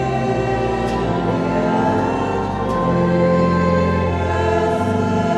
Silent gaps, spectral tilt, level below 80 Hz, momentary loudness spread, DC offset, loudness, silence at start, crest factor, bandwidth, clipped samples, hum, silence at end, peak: none; -7.5 dB/octave; -36 dBFS; 4 LU; under 0.1%; -18 LUFS; 0 s; 12 dB; 10.5 kHz; under 0.1%; none; 0 s; -4 dBFS